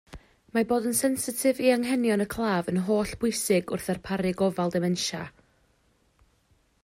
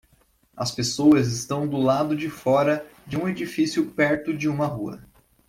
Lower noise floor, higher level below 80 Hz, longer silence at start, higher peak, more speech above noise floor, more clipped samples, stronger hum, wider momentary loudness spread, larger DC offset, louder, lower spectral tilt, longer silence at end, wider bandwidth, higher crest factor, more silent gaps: first, -67 dBFS vs -62 dBFS; about the same, -56 dBFS vs -58 dBFS; second, 0.1 s vs 0.55 s; second, -10 dBFS vs -6 dBFS; about the same, 41 dB vs 39 dB; neither; neither; second, 7 LU vs 11 LU; neither; second, -26 LUFS vs -23 LUFS; about the same, -4.5 dB/octave vs -5.5 dB/octave; first, 1.55 s vs 0.45 s; about the same, 16 kHz vs 15.5 kHz; about the same, 18 dB vs 18 dB; neither